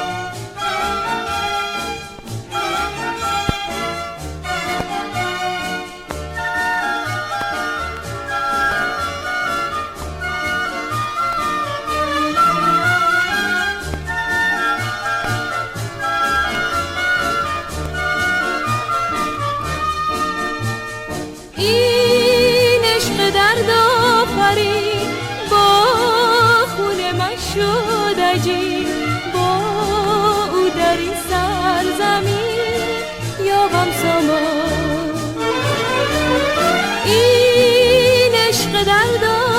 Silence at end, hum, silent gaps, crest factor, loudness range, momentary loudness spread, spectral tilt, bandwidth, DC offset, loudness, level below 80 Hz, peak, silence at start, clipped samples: 0 s; none; none; 16 dB; 8 LU; 11 LU; -4 dB/octave; 16.5 kHz; under 0.1%; -17 LUFS; -40 dBFS; -2 dBFS; 0 s; under 0.1%